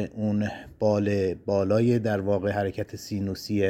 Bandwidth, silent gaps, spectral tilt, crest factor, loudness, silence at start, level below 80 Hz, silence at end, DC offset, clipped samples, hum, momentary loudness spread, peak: 16 kHz; none; -7.5 dB/octave; 14 dB; -26 LUFS; 0 s; -56 dBFS; 0 s; under 0.1%; under 0.1%; none; 9 LU; -10 dBFS